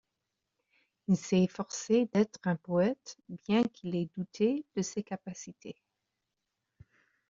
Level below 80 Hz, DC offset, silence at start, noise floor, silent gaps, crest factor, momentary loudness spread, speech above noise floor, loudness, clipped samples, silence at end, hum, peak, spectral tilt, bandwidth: -72 dBFS; under 0.1%; 1.1 s; -86 dBFS; none; 18 dB; 17 LU; 54 dB; -31 LUFS; under 0.1%; 1.55 s; none; -16 dBFS; -6.5 dB/octave; 7.6 kHz